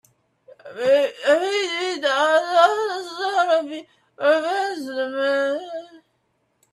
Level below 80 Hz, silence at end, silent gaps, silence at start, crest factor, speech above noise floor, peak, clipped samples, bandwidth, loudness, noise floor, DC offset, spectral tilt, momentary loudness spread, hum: -76 dBFS; 0.75 s; none; 0.65 s; 20 dB; 49 dB; -2 dBFS; under 0.1%; 13 kHz; -21 LUFS; -69 dBFS; under 0.1%; -2 dB/octave; 11 LU; none